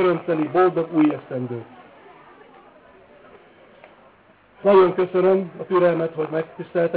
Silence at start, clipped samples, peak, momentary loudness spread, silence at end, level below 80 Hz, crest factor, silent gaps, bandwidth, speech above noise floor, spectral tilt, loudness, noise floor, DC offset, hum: 0 s; under 0.1%; -6 dBFS; 13 LU; 0 s; -66 dBFS; 16 dB; none; 4 kHz; 34 dB; -11 dB/octave; -20 LUFS; -54 dBFS; under 0.1%; none